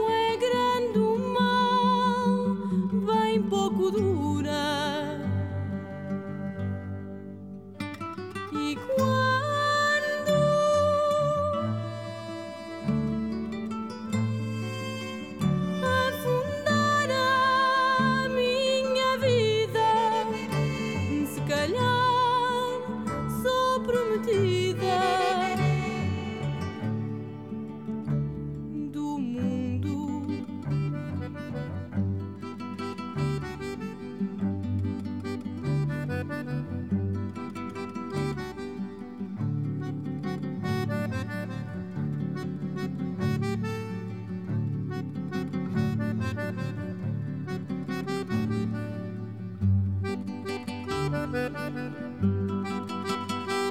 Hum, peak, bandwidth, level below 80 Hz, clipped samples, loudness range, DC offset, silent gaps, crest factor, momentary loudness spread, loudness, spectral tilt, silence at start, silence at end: none; -12 dBFS; 16.5 kHz; -54 dBFS; under 0.1%; 8 LU; 0.2%; none; 16 dB; 12 LU; -28 LUFS; -6 dB/octave; 0 s; 0 s